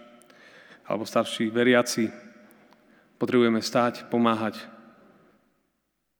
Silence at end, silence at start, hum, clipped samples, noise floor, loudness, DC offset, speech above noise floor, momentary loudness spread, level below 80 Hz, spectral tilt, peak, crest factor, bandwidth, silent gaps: 1.5 s; 0.9 s; none; under 0.1%; -76 dBFS; -25 LUFS; under 0.1%; 52 dB; 12 LU; -80 dBFS; -4.5 dB/octave; -6 dBFS; 20 dB; over 20 kHz; none